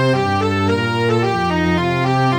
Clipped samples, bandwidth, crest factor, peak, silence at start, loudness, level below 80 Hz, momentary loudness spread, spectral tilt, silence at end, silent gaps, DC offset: under 0.1%; 15 kHz; 10 dB; -6 dBFS; 0 s; -17 LUFS; -44 dBFS; 1 LU; -6.5 dB/octave; 0 s; none; under 0.1%